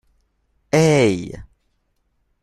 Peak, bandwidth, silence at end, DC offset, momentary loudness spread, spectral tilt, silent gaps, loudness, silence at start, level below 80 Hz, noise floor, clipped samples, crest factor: -2 dBFS; 12.5 kHz; 1 s; under 0.1%; 21 LU; -6 dB/octave; none; -17 LUFS; 0.75 s; -48 dBFS; -67 dBFS; under 0.1%; 20 dB